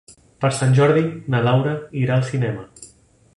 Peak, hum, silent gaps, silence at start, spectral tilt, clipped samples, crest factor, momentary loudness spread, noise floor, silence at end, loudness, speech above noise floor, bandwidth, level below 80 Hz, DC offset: -2 dBFS; none; none; 0.1 s; -6.5 dB/octave; under 0.1%; 16 dB; 10 LU; -52 dBFS; 0.5 s; -19 LUFS; 34 dB; 11.5 kHz; -54 dBFS; under 0.1%